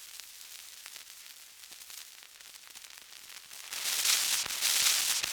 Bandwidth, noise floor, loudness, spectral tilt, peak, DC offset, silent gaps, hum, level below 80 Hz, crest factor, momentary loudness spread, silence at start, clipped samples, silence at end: over 20 kHz; -52 dBFS; -27 LUFS; 3.5 dB/octave; -10 dBFS; under 0.1%; none; none; -76 dBFS; 24 dB; 23 LU; 0 s; under 0.1%; 0 s